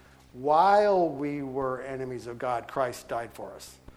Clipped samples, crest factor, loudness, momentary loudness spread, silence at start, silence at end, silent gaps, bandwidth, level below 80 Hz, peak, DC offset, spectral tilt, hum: under 0.1%; 18 dB; -27 LUFS; 18 LU; 0.35 s; 0.05 s; none; 15.5 kHz; -60 dBFS; -10 dBFS; under 0.1%; -6 dB/octave; none